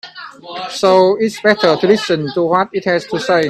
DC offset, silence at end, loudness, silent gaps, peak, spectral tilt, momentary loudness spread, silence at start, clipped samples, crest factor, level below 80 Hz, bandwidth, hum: under 0.1%; 0 s; -14 LUFS; none; 0 dBFS; -5 dB/octave; 16 LU; 0.05 s; under 0.1%; 14 dB; -58 dBFS; 13 kHz; none